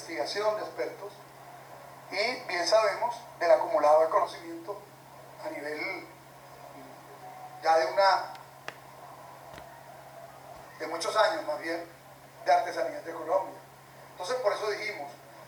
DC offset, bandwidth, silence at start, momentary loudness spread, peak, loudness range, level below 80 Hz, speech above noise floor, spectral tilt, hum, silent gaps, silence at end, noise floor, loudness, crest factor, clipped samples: under 0.1%; over 20 kHz; 0 s; 24 LU; -10 dBFS; 7 LU; -74 dBFS; 23 dB; -2.5 dB/octave; none; none; 0 s; -51 dBFS; -29 LUFS; 20 dB; under 0.1%